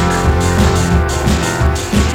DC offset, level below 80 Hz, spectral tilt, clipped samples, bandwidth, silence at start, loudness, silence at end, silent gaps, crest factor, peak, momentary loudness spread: under 0.1%; -18 dBFS; -5 dB/octave; under 0.1%; 16.5 kHz; 0 s; -14 LUFS; 0 s; none; 12 dB; 0 dBFS; 2 LU